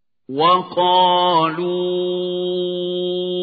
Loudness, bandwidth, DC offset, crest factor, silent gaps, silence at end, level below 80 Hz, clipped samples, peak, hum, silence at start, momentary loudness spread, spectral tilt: -18 LUFS; 4.9 kHz; under 0.1%; 14 dB; none; 0 s; -72 dBFS; under 0.1%; -4 dBFS; none; 0.3 s; 8 LU; -10.5 dB/octave